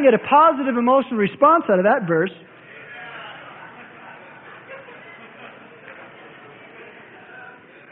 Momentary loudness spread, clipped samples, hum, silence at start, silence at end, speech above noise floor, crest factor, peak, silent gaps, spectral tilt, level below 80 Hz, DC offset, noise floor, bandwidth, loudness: 27 LU; under 0.1%; none; 0 s; 0.45 s; 27 dB; 20 dB; -2 dBFS; none; -11 dB/octave; -68 dBFS; under 0.1%; -43 dBFS; 4.1 kHz; -17 LUFS